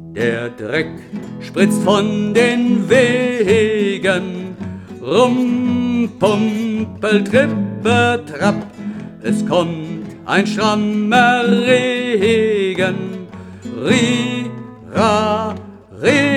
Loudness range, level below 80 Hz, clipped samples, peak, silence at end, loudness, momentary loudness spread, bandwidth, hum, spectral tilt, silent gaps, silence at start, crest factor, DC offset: 3 LU; -54 dBFS; under 0.1%; 0 dBFS; 0 s; -16 LUFS; 15 LU; 13.5 kHz; none; -5.5 dB/octave; none; 0 s; 16 dB; under 0.1%